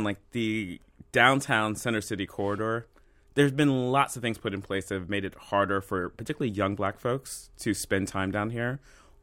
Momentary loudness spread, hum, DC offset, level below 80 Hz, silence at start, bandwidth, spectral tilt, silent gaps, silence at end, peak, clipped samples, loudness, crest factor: 10 LU; none; under 0.1%; -56 dBFS; 0 s; 16.5 kHz; -5 dB/octave; none; 0.45 s; -6 dBFS; under 0.1%; -28 LUFS; 24 dB